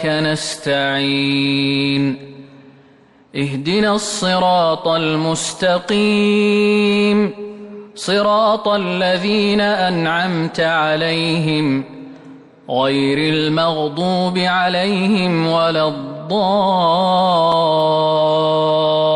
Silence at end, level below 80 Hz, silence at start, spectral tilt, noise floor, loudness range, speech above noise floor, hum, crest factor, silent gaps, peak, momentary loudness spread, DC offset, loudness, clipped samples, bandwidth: 0 s; -56 dBFS; 0 s; -5 dB/octave; -49 dBFS; 3 LU; 33 dB; none; 10 dB; none; -6 dBFS; 7 LU; under 0.1%; -16 LUFS; under 0.1%; 11.5 kHz